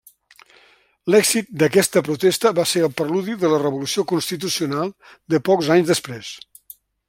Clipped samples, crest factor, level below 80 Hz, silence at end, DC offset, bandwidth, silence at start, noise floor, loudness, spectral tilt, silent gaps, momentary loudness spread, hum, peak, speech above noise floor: under 0.1%; 18 dB; -62 dBFS; 0.7 s; under 0.1%; 16.5 kHz; 1.05 s; -55 dBFS; -19 LUFS; -4 dB/octave; none; 11 LU; none; -2 dBFS; 36 dB